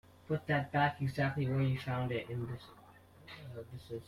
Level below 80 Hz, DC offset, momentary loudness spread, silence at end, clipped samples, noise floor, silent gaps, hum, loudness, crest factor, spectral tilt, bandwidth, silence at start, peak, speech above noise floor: -64 dBFS; under 0.1%; 16 LU; 0 s; under 0.1%; -58 dBFS; none; none; -35 LUFS; 18 dB; -7.5 dB/octave; 13.5 kHz; 0.3 s; -18 dBFS; 23 dB